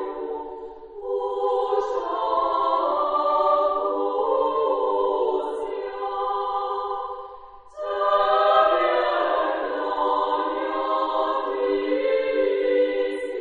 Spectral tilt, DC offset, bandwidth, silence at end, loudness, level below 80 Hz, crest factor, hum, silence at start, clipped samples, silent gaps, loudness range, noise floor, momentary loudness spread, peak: -4.5 dB/octave; under 0.1%; 7.4 kHz; 0 s; -23 LUFS; -58 dBFS; 16 dB; none; 0 s; under 0.1%; none; 4 LU; -43 dBFS; 11 LU; -6 dBFS